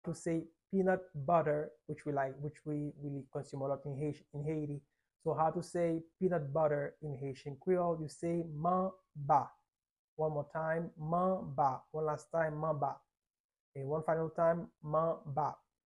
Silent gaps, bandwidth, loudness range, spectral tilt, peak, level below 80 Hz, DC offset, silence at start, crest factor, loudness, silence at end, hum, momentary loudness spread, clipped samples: 9.91-10.17 s, 13.30-13.34 s, 13.40-13.49 s, 13.60-13.72 s; 11.5 kHz; 3 LU; -8 dB/octave; -18 dBFS; -70 dBFS; under 0.1%; 0.05 s; 18 dB; -37 LUFS; 0.35 s; none; 11 LU; under 0.1%